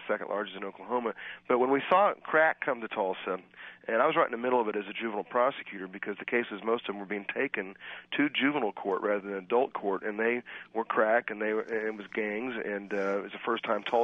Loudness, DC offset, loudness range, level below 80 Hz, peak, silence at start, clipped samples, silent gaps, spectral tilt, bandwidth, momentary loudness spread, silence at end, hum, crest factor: -30 LUFS; under 0.1%; 4 LU; -80 dBFS; -10 dBFS; 0 s; under 0.1%; none; -6.5 dB/octave; 6.6 kHz; 11 LU; 0 s; none; 20 dB